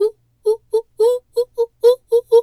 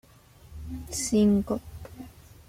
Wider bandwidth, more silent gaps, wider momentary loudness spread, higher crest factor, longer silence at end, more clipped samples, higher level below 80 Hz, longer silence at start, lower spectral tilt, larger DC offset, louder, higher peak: second, 14 kHz vs 15.5 kHz; neither; second, 8 LU vs 24 LU; about the same, 14 dB vs 16 dB; second, 0 s vs 0.4 s; neither; second, -62 dBFS vs -48 dBFS; second, 0 s vs 0.5 s; second, -3 dB/octave vs -5.5 dB/octave; neither; first, -18 LUFS vs -26 LUFS; first, -2 dBFS vs -14 dBFS